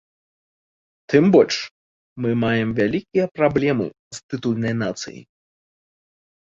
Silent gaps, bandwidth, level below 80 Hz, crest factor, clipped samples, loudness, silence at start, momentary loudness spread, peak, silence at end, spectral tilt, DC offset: 1.71-2.16 s, 3.99-4.11 s, 4.23-4.29 s; 7.8 kHz; -54 dBFS; 20 dB; under 0.1%; -20 LUFS; 1.1 s; 16 LU; -2 dBFS; 1.25 s; -6 dB/octave; under 0.1%